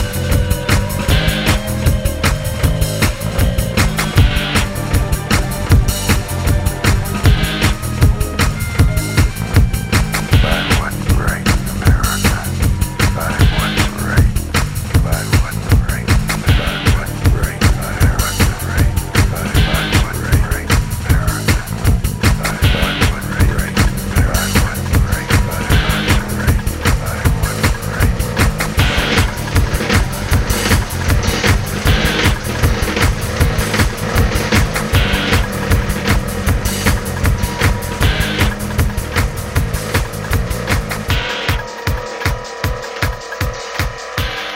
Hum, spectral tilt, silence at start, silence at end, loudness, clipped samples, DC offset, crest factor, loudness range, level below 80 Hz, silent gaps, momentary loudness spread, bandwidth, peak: none; -4.5 dB/octave; 0 s; 0 s; -16 LUFS; under 0.1%; under 0.1%; 14 dB; 2 LU; -20 dBFS; none; 4 LU; 16.5 kHz; 0 dBFS